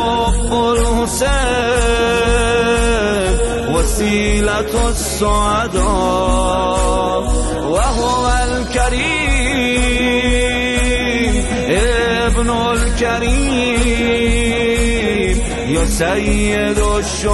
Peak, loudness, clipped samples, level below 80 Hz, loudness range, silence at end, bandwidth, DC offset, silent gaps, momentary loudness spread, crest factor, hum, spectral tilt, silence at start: -4 dBFS; -15 LUFS; under 0.1%; -20 dBFS; 1 LU; 0 s; 12 kHz; under 0.1%; none; 3 LU; 12 dB; none; -4 dB/octave; 0 s